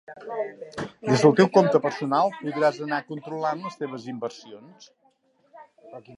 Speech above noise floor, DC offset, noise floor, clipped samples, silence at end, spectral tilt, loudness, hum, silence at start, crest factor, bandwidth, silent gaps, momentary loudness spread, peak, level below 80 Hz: 41 dB; under 0.1%; -65 dBFS; under 0.1%; 0 s; -6 dB/octave; -24 LUFS; none; 0.1 s; 22 dB; 11 kHz; none; 17 LU; -2 dBFS; -70 dBFS